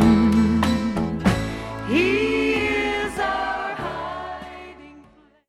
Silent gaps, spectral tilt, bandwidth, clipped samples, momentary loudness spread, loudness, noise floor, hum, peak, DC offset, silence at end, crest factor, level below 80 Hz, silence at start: none; -6 dB/octave; 13.5 kHz; under 0.1%; 15 LU; -22 LUFS; -52 dBFS; none; -4 dBFS; under 0.1%; 0.5 s; 16 dB; -38 dBFS; 0 s